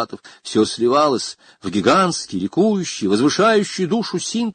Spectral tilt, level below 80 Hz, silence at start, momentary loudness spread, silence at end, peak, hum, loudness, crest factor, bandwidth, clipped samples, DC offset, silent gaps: -4.5 dB/octave; -56 dBFS; 0 s; 10 LU; 0 s; -2 dBFS; none; -18 LUFS; 16 dB; 9.6 kHz; under 0.1%; under 0.1%; none